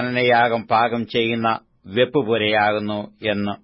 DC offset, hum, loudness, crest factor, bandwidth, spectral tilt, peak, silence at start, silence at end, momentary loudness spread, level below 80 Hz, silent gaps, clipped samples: under 0.1%; none; -20 LUFS; 14 dB; 5.8 kHz; -10 dB/octave; -6 dBFS; 0 s; 0.1 s; 8 LU; -60 dBFS; none; under 0.1%